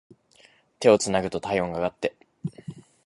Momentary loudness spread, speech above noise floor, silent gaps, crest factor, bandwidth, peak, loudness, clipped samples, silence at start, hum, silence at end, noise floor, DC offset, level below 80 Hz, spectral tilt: 18 LU; 35 dB; none; 22 dB; 11.5 kHz; -4 dBFS; -24 LUFS; under 0.1%; 0.8 s; none; 0.25 s; -58 dBFS; under 0.1%; -56 dBFS; -4.5 dB/octave